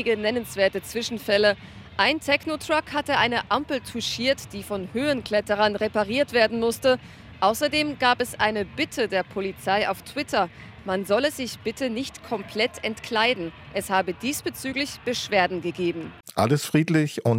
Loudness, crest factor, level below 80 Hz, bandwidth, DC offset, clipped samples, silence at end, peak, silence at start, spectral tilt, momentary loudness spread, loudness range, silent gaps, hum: -24 LUFS; 22 dB; -56 dBFS; 16.5 kHz; under 0.1%; under 0.1%; 0 s; -4 dBFS; 0 s; -4.5 dB/octave; 9 LU; 3 LU; none; none